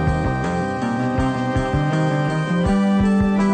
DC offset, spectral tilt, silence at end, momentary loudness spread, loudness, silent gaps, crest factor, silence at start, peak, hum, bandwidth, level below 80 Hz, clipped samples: under 0.1%; -7.5 dB/octave; 0 s; 5 LU; -20 LUFS; none; 12 dB; 0 s; -6 dBFS; none; 9 kHz; -32 dBFS; under 0.1%